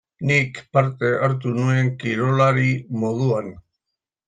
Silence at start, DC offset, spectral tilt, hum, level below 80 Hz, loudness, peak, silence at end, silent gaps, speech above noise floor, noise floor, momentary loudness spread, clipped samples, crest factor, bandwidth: 0.2 s; under 0.1%; -7 dB/octave; none; -58 dBFS; -20 LUFS; -4 dBFS; 0.7 s; none; 63 dB; -83 dBFS; 6 LU; under 0.1%; 18 dB; 9 kHz